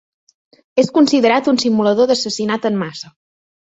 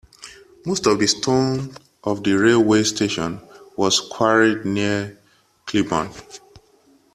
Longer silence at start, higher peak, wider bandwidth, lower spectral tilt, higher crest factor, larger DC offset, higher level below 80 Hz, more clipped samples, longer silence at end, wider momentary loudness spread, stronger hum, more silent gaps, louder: first, 0.75 s vs 0.2 s; about the same, -2 dBFS vs -2 dBFS; second, 8.2 kHz vs 13.5 kHz; about the same, -4.5 dB/octave vs -4 dB/octave; about the same, 16 dB vs 18 dB; neither; second, -60 dBFS vs -54 dBFS; neither; about the same, 0.65 s vs 0.75 s; second, 12 LU vs 20 LU; neither; neither; first, -15 LUFS vs -19 LUFS